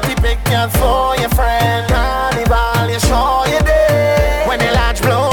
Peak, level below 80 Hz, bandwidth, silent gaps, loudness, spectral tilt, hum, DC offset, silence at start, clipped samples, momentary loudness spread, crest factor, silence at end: -4 dBFS; -20 dBFS; 19 kHz; none; -14 LUFS; -5 dB/octave; none; under 0.1%; 0 s; under 0.1%; 3 LU; 10 dB; 0 s